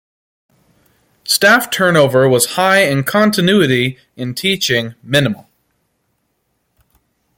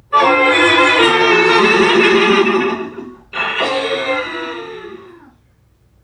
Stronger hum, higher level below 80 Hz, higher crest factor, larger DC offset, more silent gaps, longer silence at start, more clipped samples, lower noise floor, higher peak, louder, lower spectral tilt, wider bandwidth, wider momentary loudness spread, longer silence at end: neither; about the same, -54 dBFS vs -52 dBFS; about the same, 16 dB vs 14 dB; neither; neither; first, 1.25 s vs 0.1 s; neither; first, -67 dBFS vs -53 dBFS; about the same, 0 dBFS vs 0 dBFS; about the same, -13 LUFS vs -12 LUFS; about the same, -4 dB/octave vs -3.5 dB/octave; first, 17 kHz vs 10.5 kHz; second, 10 LU vs 17 LU; first, 2 s vs 1 s